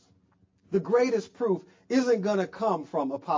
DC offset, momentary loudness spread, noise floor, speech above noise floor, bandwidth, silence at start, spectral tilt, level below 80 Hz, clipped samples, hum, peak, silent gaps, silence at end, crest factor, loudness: under 0.1%; 6 LU; -65 dBFS; 39 dB; 7.6 kHz; 0.7 s; -6 dB/octave; -74 dBFS; under 0.1%; none; -12 dBFS; none; 0 s; 16 dB; -27 LUFS